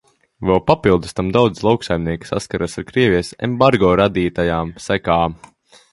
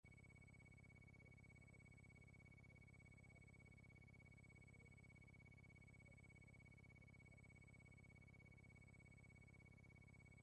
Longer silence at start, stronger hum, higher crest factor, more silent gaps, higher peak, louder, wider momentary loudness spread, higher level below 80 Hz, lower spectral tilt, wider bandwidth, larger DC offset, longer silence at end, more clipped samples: first, 0.4 s vs 0.05 s; second, none vs 50 Hz at -75 dBFS; first, 18 dB vs 10 dB; neither; first, 0 dBFS vs -56 dBFS; first, -17 LUFS vs -67 LUFS; first, 9 LU vs 0 LU; first, -38 dBFS vs -74 dBFS; about the same, -6.5 dB/octave vs -6 dB/octave; first, 11.5 kHz vs 10 kHz; neither; first, 0.6 s vs 0 s; neither